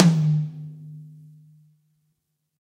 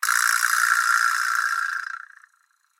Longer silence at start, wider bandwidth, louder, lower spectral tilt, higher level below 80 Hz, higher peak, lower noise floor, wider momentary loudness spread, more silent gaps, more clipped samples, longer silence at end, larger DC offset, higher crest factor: about the same, 0 s vs 0 s; second, 9.4 kHz vs 17 kHz; about the same, -22 LUFS vs -20 LUFS; first, -7 dB/octave vs 11 dB/octave; first, -68 dBFS vs under -90 dBFS; first, 0 dBFS vs -4 dBFS; first, -75 dBFS vs -65 dBFS; first, 24 LU vs 12 LU; neither; neither; first, 1.65 s vs 0.8 s; neither; first, 24 dB vs 18 dB